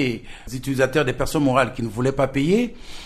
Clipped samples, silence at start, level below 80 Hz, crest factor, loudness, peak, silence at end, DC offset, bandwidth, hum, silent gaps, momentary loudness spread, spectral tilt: under 0.1%; 0 s; -38 dBFS; 18 dB; -21 LUFS; -4 dBFS; 0 s; under 0.1%; 13.5 kHz; none; none; 10 LU; -6 dB/octave